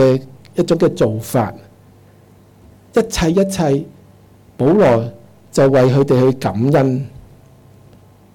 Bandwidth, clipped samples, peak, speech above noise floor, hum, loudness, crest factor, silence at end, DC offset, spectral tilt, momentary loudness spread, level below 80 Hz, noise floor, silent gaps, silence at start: 18.5 kHz; under 0.1%; -6 dBFS; 32 dB; none; -15 LUFS; 10 dB; 1.2 s; under 0.1%; -7 dB/octave; 11 LU; -40 dBFS; -46 dBFS; none; 0 s